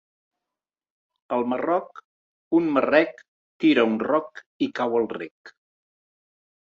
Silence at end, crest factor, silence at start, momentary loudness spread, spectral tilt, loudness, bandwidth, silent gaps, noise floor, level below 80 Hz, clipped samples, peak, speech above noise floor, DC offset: 1.15 s; 20 dB; 1.3 s; 12 LU; -6.5 dB/octave; -23 LUFS; 7 kHz; 2.05-2.51 s, 3.28-3.60 s, 4.46-4.60 s, 5.31-5.44 s; -89 dBFS; -70 dBFS; under 0.1%; -4 dBFS; 66 dB; under 0.1%